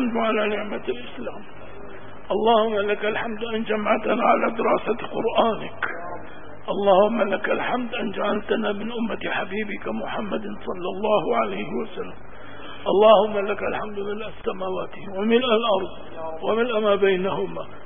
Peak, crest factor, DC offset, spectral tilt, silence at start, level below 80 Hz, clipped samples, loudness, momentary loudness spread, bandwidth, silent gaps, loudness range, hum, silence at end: -2 dBFS; 22 dB; 2%; -10 dB/octave; 0 s; -54 dBFS; under 0.1%; -23 LUFS; 16 LU; 3.7 kHz; none; 4 LU; none; 0 s